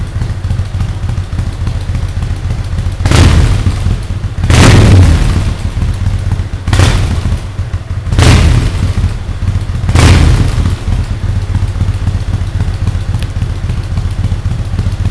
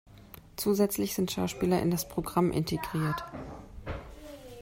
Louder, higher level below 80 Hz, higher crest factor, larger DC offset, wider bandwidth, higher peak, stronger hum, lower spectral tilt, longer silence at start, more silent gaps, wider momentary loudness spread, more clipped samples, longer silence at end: first, -12 LUFS vs -30 LUFS; first, -14 dBFS vs -52 dBFS; second, 10 dB vs 18 dB; first, 0.7% vs under 0.1%; second, 11 kHz vs 16 kHz; first, 0 dBFS vs -12 dBFS; neither; about the same, -6 dB/octave vs -5.5 dB/octave; about the same, 0 s vs 0.1 s; neither; second, 11 LU vs 19 LU; first, 2% vs under 0.1%; about the same, 0 s vs 0 s